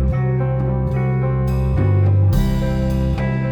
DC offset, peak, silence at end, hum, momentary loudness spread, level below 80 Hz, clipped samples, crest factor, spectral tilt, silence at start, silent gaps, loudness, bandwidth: 0.2%; -4 dBFS; 0 s; none; 4 LU; -24 dBFS; under 0.1%; 12 dB; -9 dB/octave; 0 s; none; -18 LUFS; 18 kHz